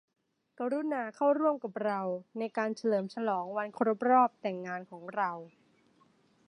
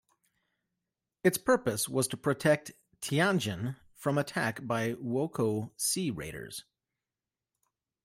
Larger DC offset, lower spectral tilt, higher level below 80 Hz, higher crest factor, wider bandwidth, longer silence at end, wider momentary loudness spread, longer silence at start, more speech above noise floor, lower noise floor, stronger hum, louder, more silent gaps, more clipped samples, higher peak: neither; first, -7 dB/octave vs -4.5 dB/octave; second, -88 dBFS vs -66 dBFS; about the same, 20 dB vs 22 dB; second, 10.5 kHz vs 16 kHz; second, 1 s vs 1.45 s; about the same, 13 LU vs 12 LU; second, 0.6 s vs 1.25 s; second, 36 dB vs over 59 dB; second, -67 dBFS vs under -90 dBFS; neither; about the same, -32 LUFS vs -31 LUFS; neither; neither; about the same, -12 dBFS vs -10 dBFS